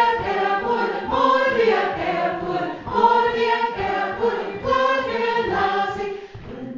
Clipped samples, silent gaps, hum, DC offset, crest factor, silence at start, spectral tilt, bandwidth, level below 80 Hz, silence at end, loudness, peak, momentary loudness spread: under 0.1%; none; none; under 0.1%; 16 dB; 0 s; -5.5 dB/octave; 7.6 kHz; -48 dBFS; 0 s; -21 LUFS; -4 dBFS; 8 LU